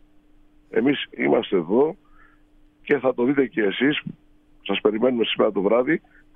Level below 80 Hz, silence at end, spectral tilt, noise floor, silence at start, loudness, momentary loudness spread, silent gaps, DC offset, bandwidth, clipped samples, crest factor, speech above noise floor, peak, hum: -58 dBFS; 0.4 s; -8.5 dB/octave; -55 dBFS; 0.7 s; -22 LUFS; 7 LU; none; under 0.1%; 3.9 kHz; under 0.1%; 18 dB; 34 dB; -6 dBFS; none